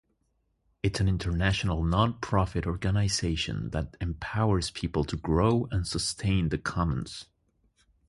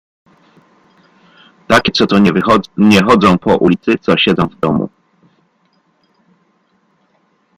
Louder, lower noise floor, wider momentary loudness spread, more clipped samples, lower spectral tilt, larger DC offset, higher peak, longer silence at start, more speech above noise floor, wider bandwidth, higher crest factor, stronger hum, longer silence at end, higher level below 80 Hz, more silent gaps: second, -29 LUFS vs -11 LUFS; first, -74 dBFS vs -58 dBFS; about the same, 7 LU vs 7 LU; neither; about the same, -5.5 dB/octave vs -6 dB/octave; neither; second, -8 dBFS vs 0 dBFS; second, 0.85 s vs 1.7 s; about the same, 46 dB vs 47 dB; second, 11.5 kHz vs 14 kHz; first, 20 dB vs 14 dB; neither; second, 0.85 s vs 2.7 s; first, -40 dBFS vs -46 dBFS; neither